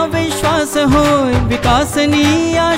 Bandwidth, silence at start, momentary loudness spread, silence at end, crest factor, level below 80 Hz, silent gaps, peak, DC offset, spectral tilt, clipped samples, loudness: 16 kHz; 0 s; 3 LU; 0 s; 10 dB; -28 dBFS; none; -2 dBFS; 0.5%; -5 dB/octave; under 0.1%; -13 LUFS